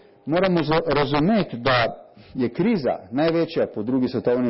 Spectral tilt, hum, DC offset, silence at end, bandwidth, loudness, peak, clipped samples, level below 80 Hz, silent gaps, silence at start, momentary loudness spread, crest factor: -11 dB/octave; none; under 0.1%; 0 s; 5.8 kHz; -22 LUFS; -8 dBFS; under 0.1%; -50 dBFS; none; 0.25 s; 6 LU; 14 dB